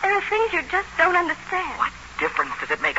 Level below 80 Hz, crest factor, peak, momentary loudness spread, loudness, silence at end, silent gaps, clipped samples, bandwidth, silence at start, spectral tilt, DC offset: -50 dBFS; 18 dB; -4 dBFS; 7 LU; -22 LUFS; 0 s; none; under 0.1%; 8 kHz; 0 s; -3.5 dB/octave; 0.2%